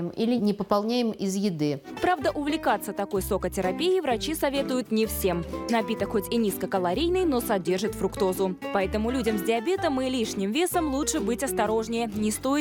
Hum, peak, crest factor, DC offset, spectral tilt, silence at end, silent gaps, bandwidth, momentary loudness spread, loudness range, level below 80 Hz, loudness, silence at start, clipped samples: none; -8 dBFS; 18 dB; under 0.1%; -4.5 dB/octave; 0 s; none; 17.5 kHz; 3 LU; 1 LU; -46 dBFS; -26 LUFS; 0 s; under 0.1%